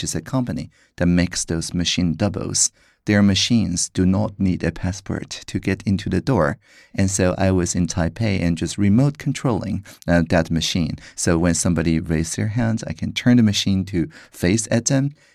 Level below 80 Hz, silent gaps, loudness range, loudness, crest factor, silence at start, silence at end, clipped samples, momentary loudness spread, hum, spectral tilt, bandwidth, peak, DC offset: -40 dBFS; none; 2 LU; -20 LUFS; 16 dB; 0 s; 0.2 s; under 0.1%; 9 LU; none; -5 dB/octave; 14 kHz; -4 dBFS; under 0.1%